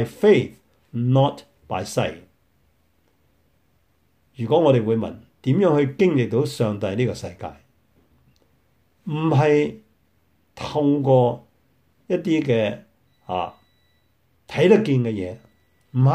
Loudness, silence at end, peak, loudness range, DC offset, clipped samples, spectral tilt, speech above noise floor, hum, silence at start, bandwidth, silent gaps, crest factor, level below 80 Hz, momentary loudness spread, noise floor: -21 LUFS; 0 s; -4 dBFS; 6 LU; under 0.1%; under 0.1%; -7.5 dB/octave; 45 dB; none; 0 s; 12.5 kHz; none; 18 dB; -60 dBFS; 16 LU; -65 dBFS